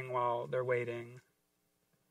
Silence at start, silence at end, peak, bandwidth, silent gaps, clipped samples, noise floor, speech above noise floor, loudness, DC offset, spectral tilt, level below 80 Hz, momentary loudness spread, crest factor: 0 s; 0.9 s; -22 dBFS; 12.5 kHz; none; under 0.1%; -79 dBFS; 43 dB; -36 LUFS; under 0.1%; -7.5 dB/octave; -82 dBFS; 11 LU; 18 dB